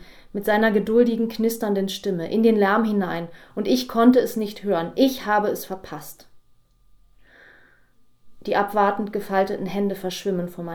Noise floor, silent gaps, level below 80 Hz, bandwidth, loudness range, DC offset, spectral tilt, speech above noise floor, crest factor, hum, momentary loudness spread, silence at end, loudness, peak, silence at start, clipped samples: -56 dBFS; none; -56 dBFS; 20 kHz; 8 LU; under 0.1%; -5.5 dB/octave; 34 dB; 18 dB; none; 14 LU; 0 s; -22 LUFS; -4 dBFS; 0.1 s; under 0.1%